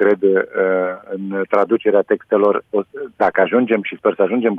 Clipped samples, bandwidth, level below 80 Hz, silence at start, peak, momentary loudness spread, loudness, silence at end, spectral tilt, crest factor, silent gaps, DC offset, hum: under 0.1%; 4.5 kHz; -64 dBFS; 0 s; -2 dBFS; 8 LU; -17 LUFS; 0 s; -8.5 dB/octave; 14 dB; none; under 0.1%; none